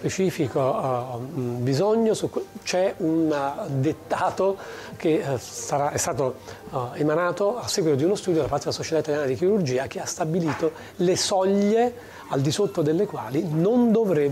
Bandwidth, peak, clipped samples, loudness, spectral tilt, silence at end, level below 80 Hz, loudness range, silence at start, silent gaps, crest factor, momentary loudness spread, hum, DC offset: 16 kHz; -12 dBFS; under 0.1%; -24 LUFS; -5.5 dB/octave; 0 s; -58 dBFS; 3 LU; 0 s; none; 10 dB; 9 LU; none; under 0.1%